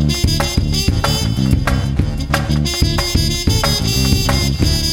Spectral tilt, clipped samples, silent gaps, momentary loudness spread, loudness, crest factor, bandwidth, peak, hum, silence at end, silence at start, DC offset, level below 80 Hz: -4.5 dB/octave; under 0.1%; none; 3 LU; -16 LUFS; 16 dB; 17 kHz; 0 dBFS; none; 0 s; 0 s; under 0.1%; -20 dBFS